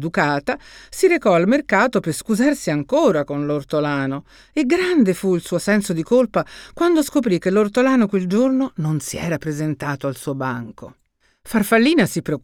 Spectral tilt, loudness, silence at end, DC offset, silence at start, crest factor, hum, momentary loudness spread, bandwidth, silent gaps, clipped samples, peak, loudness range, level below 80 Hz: -5.5 dB/octave; -19 LUFS; 0.05 s; under 0.1%; 0 s; 16 dB; none; 9 LU; 19 kHz; none; under 0.1%; -2 dBFS; 4 LU; -52 dBFS